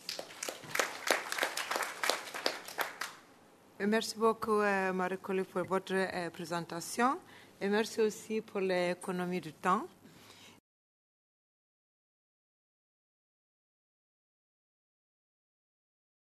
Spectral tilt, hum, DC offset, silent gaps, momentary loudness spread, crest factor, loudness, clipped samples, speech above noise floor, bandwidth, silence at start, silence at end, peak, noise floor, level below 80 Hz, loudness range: -3.5 dB/octave; none; under 0.1%; none; 9 LU; 30 dB; -34 LUFS; under 0.1%; 27 dB; 13.5 kHz; 0 s; 5.7 s; -6 dBFS; -61 dBFS; -80 dBFS; 5 LU